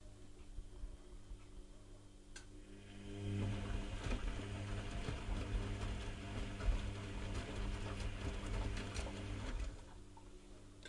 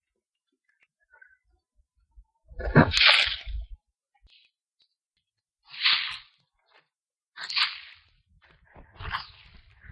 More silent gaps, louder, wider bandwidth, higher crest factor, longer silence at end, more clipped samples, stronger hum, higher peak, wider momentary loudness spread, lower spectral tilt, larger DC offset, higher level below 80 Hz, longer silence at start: second, none vs 7.28-7.32 s; second, -46 LUFS vs -23 LUFS; about the same, 11.5 kHz vs 11.5 kHz; second, 20 dB vs 28 dB; second, 0 s vs 0.65 s; neither; neither; second, -26 dBFS vs -4 dBFS; second, 17 LU vs 25 LU; about the same, -5.5 dB/octave vs -4.5 dB/octave; neither; about the same, -46 dBFS vs -46 dBFS; second, 0 s vs 2.55 s